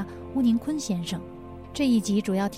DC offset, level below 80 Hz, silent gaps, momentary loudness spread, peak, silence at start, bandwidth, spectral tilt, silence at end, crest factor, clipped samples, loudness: 0.2%; -54 dBFS; none; 14 LU; -14 dBFS; 0 s; 15.5 kHz; -5.5 dB/octave; 0 s; 12 dB; under 0.1%; -26 LUFS